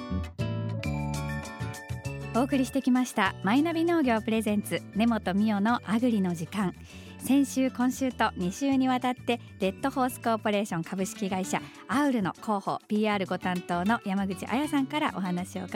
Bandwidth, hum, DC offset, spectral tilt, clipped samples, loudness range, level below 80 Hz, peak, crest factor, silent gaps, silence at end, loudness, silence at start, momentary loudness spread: 16.5 kHz; none; under 0.1%; -5.5 dB/octave; under 0.1%; 3 LU; -52 dBFS; -10 dBFS; 18 dB; none; 0 s; -28 LUFS; 0 s; 8 LU